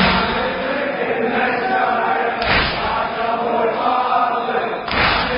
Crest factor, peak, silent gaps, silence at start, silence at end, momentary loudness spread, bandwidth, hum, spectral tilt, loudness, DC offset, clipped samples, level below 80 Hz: 16 dB; -2 dBFS; none; 0 s; 0 s; 4 LU; 5.4 kHz; none; -9 dB/octave; -18 LUFS; under 0.1%; under 0.1%; -38 dBFS